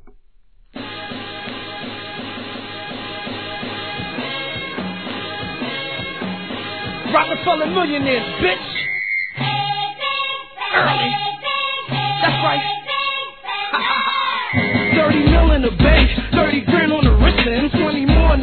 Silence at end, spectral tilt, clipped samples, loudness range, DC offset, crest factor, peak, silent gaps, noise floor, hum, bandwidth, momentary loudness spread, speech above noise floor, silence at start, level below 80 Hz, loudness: 0 s; -8.5 dB/octave; under 0.1%; 12 LU; 0.4%; 18 dB; 0 dBFS; none; -51 dBFS; none; 4.6 kHz; 14 LU; 36 dB; 0 s; -24 dBFS; -19 LUFS